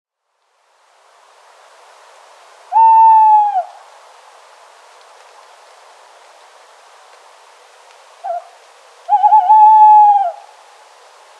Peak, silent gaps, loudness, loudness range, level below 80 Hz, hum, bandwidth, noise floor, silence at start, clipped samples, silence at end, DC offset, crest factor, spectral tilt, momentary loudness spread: 0 dBFS; none; -9 LUFS; 22 LU; under -90 dBFS; none; 8 kHz; -66 dBFS; 2.7 s; under 0.1%; 1.05 s; under 0.1%; 14 dB; 2.5 dB/octave; 20 LU